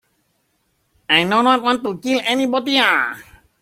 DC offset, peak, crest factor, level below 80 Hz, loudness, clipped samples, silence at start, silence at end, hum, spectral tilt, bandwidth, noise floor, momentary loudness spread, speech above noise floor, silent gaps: under 0.1%; -2 dBFS; 18 dB; -60 dBFS; -16 LUFS; under 0.1%; 1.1 s; 0.4 s; none; -3.5 dB/octave; 16 kHz; -66 dBFS; 7 LU; 49 dB; none